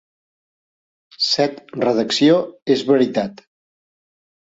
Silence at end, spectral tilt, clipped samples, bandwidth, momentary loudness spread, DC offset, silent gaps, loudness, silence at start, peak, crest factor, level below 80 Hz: 1.05 s; -4.5 dB/octave; under 0.1%; 8 kHz; 7 LU; under 0.1%; 2.62-2.66 s; -18 LUFS; 1.2 s; -4 dBFS; 18 dB; -64 dBFS